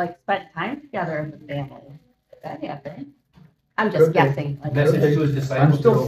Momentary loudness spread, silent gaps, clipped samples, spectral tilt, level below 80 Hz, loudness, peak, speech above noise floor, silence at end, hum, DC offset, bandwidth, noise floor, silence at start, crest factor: 20 LU; none; under 0.1%; -8 dB/octave; -56 dBFS; -21 LUFS; -2 dBFS; 33 dB; 0 s; none; under 0.1%; 13.5 kHz; -53 dBFS; 0 s; 20 dB